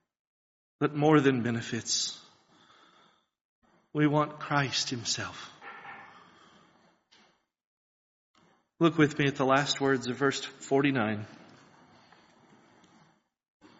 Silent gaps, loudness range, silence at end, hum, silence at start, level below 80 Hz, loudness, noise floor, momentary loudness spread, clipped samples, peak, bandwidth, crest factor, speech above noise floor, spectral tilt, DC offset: 3.41-3.62 s, 7.65-8.34 s; 8 LU; 2.45 s; none; 0.8 s; -70 dBFS; -28 LUFS; -67 dBFS; 20 LU; under 0.1%; -8 dBFS; 8 kHz; 24 dB; 39 dB; -4 dB/octave; under 0.1%